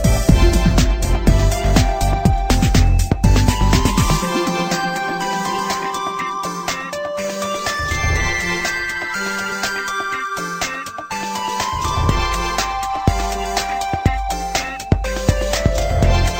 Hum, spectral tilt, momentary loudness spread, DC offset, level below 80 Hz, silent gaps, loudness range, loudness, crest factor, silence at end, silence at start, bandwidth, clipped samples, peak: none; -4.5 dB/octave; 8 LU; under 0.1%; -22 dBFS; none; 5 LU; -19 LUFS; 16 dB; 0 s; 0 s; 16.5 kHz; under 0.1%; 0 dBFS